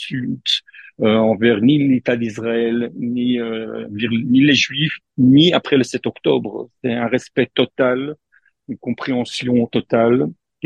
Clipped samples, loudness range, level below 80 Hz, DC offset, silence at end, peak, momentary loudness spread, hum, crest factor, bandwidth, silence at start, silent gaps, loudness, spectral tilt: under 0.1%; 5 LU; -60 dBFS; under 0.1%; 0.35 s; 0 dBFS; 12 LU; none; 18 dB; 9.8 kHz; 0 s; none; -17 LUFS; -5.5 dB/octave